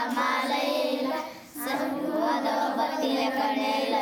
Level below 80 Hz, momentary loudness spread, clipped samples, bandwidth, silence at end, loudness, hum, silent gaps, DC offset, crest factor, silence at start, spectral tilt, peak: -74 dBFS; 5 LU; under 0.1%; over 20 kHz; 0 s; -27 LUFS; none; none; under 0.1%; 14 dB; 0 s; -3 dB/octave; -14 dBFS